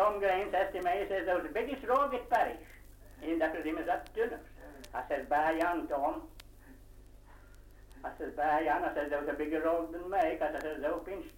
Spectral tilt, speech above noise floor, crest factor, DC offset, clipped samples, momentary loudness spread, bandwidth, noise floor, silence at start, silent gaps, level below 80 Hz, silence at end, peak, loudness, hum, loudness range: -5.5 dB/octave; 21 dB; 16 dB; under 0.1%; under 0.1%; 12 LU; 16.5 kHz; -54 dBFS; 0 s; none; -54 dBFS; 0 s; -18 dBFS; -33 LUFS; 50 Hz at -60 dBFS; 3 LU